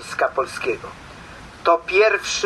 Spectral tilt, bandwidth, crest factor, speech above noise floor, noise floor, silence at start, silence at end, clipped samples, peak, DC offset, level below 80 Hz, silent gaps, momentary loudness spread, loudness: -2.5 dB/octave; 12.5 kHz; 18 dB; 20 dB; -40 dBFS; 0 s; 0 s; under 0.1%; -2 dBFS; under 0.1%; -50 dBFS; none; 23 LU; -20 LUFS